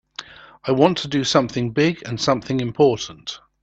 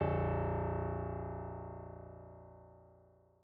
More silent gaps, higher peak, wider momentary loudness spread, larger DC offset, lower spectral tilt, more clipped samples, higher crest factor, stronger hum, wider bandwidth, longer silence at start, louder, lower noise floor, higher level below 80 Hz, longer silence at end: neither; first, 0 dBFS vs -20 dBFS; second, 15 LU vs 22 LU; neither; second, -5 dB/octave vs -8.5 dB/octave; neither; about the same, 20 dB vs 20 dB; second, none vs 60 Hz at -85 dBFS; first, 8.4 kHz vs 4 kHz; first, 0.2 s vs 0 s; first, -20 LUFS vs -39 LUFS; second, -40 dBFS vs -66 dBFS; about the same, -54 dBFS vs -54 dBFS; second, 0.25 s vs 0.5 s